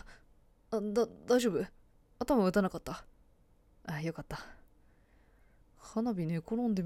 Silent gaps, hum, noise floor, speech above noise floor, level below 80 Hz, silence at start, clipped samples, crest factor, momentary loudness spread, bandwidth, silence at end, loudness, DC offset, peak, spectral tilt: none; none; -65 dBFS; 32 dB; -58 dBFS; 0.05 s; under 0.1%; 18 dB; 16 LU; 17 kHz; 0 s; -34 LUFS; under 0.1%; -16 dBFS; -6.5 dB/octave